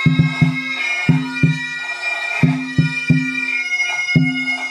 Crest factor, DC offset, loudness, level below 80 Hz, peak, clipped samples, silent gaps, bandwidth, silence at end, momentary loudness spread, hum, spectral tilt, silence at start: 16 dB; under 0.1%; -17 LUFS; -48 dBFS; -2 dBFS; under 0.1%; none; 10.5 kHz; 0 s; 4 LU; none; -5.5 dB/octave; 0 s